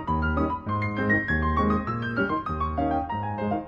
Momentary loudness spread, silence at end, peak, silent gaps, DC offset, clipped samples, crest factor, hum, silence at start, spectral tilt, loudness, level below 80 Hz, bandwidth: 5 LU; 0 s; -12 dBFS; none; under 0.1%; under 0.1%; 14 dB; none; 0 s; -9 dB/octave; -26 LUFS; -36 dBFS; 6 kHz